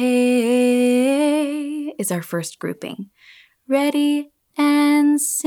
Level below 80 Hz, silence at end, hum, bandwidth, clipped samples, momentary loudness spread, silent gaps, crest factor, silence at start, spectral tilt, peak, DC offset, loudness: -76 dBFS; 0.05 s; none; 18 kHz; under 0.1%; 14 LU; none; 12 dB; 0 s; -4 dB/octave; -8 dBFS; under 0.1%; -19 LUFS